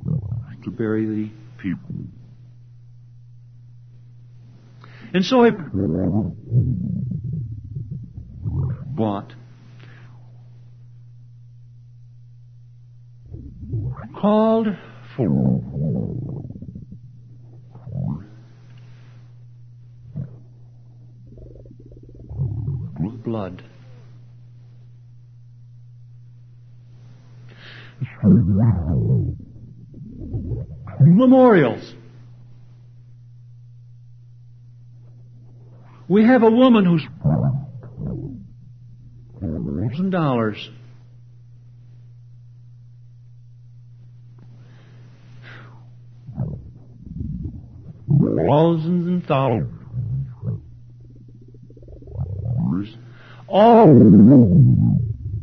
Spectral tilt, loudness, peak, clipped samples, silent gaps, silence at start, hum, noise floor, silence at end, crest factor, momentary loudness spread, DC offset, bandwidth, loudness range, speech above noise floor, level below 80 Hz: -9.5 dB/octave; -19 LUFS; 0 dBFS; under 0.1%; none; 0 s; none; -44 dBFS; 0 s; 20 dB; 25 LU; under 0.1%; 6.4 kHz; 18 LU; 29 dB; -44 dBFS